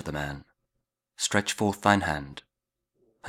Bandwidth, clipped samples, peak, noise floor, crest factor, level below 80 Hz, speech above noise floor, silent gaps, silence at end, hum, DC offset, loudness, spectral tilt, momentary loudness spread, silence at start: 17 kHz; under 0.1%; -4 dBFS; -84 dBFS; 26 dB; -52 dBFS; 57 dB; none; 0 s; none; under 0.1%; -27 LUFS; -4 dB/octave; 20 LU; 0 s